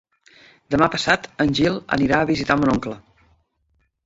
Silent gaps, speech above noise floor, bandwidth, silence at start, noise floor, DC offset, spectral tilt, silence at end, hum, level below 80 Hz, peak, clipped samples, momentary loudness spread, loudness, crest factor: none; 48 dB; 7.8 kHz; 0.7 s; -67 dBFS; under 0.1%; -5.5 dB/octave; 1.05 s; none; -46 dBFS; -2 dBFS; under 0.1%; 6 LU; -20 LUFS; 20 dB